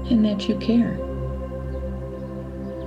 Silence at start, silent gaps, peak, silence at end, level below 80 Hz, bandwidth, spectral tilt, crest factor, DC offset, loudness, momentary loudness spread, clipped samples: 0 s; none; -8 dBFS; 0 s; -34 dBFS; 8 kHz; -8 dB/octave; 16 dB; under 0.1%; -25 LUFS; 12 LU; under 0.1%